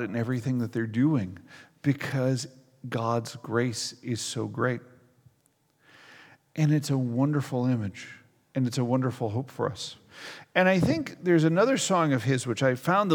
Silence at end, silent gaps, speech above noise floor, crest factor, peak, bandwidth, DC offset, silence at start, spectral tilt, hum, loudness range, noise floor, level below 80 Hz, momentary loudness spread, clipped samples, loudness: 0 s; none; 42 dB; 20 dB; -8 dBFS; 18 kHz; under 0.1%; 0 s; -6 dB/octave; none; 6 LU; -68 dBFS; -66 dBFS; 15 LU; under 0.1%; -27 LUFS